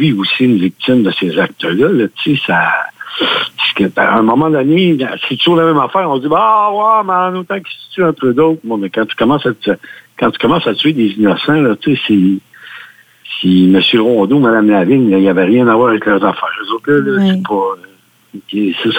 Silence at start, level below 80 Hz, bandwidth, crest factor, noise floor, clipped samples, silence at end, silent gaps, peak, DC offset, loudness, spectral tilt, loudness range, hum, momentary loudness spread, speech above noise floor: 0 s; -54 dBFS; 17 kHz; 12 dB; -37 dBFS; under 0.1%; 0 s; none; 0 dBFS; under 0.1%; -12 LUFS; -7.5 dB/octave; 3 LU; none; 8 LU; 26 dB